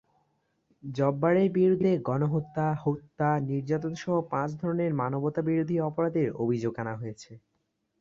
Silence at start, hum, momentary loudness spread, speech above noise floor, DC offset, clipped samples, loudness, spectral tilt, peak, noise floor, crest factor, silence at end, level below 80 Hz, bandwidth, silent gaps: 0.85 s; none; 10 LU; 50 dB; under 0.1%; under 0.1%; -28 LUFS; -8.5 dB/octave; -12 dBFS; -77 dBFS; 16 dB; 0.65 s; -64 dBFS; 7.6 kHz; none